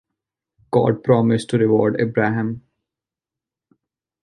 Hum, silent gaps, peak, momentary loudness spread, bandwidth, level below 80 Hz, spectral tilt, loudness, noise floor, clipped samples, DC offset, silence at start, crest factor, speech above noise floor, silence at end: none; none; -2 dBFS; 8 LU; 11.5 kHz; -58 dBFS; -8 dB/octave; -19 LUFS; -88 dBFS; under 0.1%; under 0.1%; 0.7 s; 18 dB; 71 dB; 1.65 s